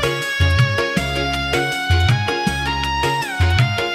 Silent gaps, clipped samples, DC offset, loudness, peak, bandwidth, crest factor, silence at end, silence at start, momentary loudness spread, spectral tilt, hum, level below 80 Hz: none; under 0.1%; under 0.1%; -18 LUFS; -4 dBFS; 15.5 kHz; 14 dB; 0 s; 0 s; 4 LU; -5 dB/octave; none; -32 dBFS